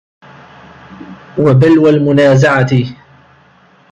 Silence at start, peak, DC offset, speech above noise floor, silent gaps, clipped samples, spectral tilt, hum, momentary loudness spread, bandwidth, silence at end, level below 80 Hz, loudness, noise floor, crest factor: 1 s; 0 dBFS; under 0.1%; 37 dB; none; under 0.1%; -7.5 dB/octave; none; 16 LU; 8.2 kHz; 1 s; -48 dBFS; -9 LUFS; -46 dBFS; 12 dB